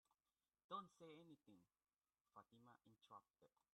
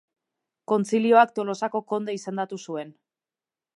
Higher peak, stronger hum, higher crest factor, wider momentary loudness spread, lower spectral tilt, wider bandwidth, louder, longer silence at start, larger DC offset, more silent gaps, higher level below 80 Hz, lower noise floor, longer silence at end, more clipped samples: second, -40 dBFS vs -6 dBFS; neither; about the same, 24 dB vs 20 dB; second, 12 LU vs 16 LU; about the same, -5.5 dB/octave vs -5.5 dB/octave; second, 10 kHz vs 11.5 kHz; second, -61 LUFS vs -24 LUFS; second, 0.1 s vs 0.7 s; neither; first, 0.64-0.69 s, 2.21-2.25 s vs none; second, under -90 dBFS vs -82 dBFS; about the same, under -90 dBFS vs under -90 dBFS; second, 0.25 s vs 0.85 s; neither